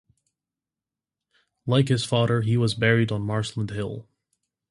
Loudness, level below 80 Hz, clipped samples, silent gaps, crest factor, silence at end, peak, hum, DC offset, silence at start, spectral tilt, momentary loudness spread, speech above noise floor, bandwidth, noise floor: -24 LUFS; -54 dBFS; under 0.1%; none; 20 dB; 0.7 s; -4 dBFS; none; under 0.1%; 1.65 s; -6 dB/octave; 12 LU; 67 dB; 11.5 kHz; -89 dBFS